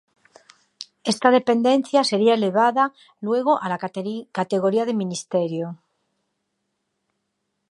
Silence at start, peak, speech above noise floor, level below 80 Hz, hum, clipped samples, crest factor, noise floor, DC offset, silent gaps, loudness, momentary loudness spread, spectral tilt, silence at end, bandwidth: 0.8 s; -2 dBFS; 56 dB; -76 dBFS; none; under 0.1%; 22 dB; -76 dBFS; under 0.1%; none; -21 LUFS; 12 LU; -5 dB/octave; 1.95 s; 11.5 kHz